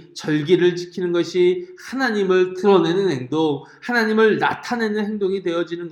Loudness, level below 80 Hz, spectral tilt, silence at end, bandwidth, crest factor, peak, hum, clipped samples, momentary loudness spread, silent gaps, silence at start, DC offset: -20 LUFS; -68 dBFS; -6 dB/octave; 0 s; 11.5 kHz; 16 dB; -2 dBFS; none; under 0.1%; 7 LU; none; 0 s; under 0.1%